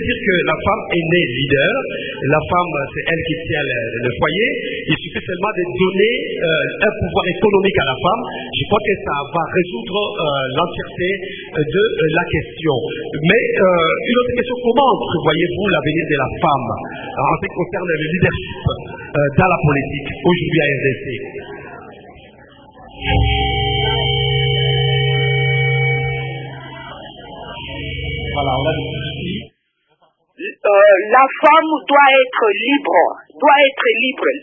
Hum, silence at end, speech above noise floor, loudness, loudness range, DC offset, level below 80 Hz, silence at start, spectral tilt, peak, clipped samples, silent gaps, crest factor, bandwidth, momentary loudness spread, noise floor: none; 0 s; 48 dB; -16 LUFS; 8 LU; under 0.1%; -36 dBFS; 0 s; -9 dB/octave; 0 dBFS; under 0.1%; none; 16 dB; 3.8 kHz; 12 LU; -64 dBFS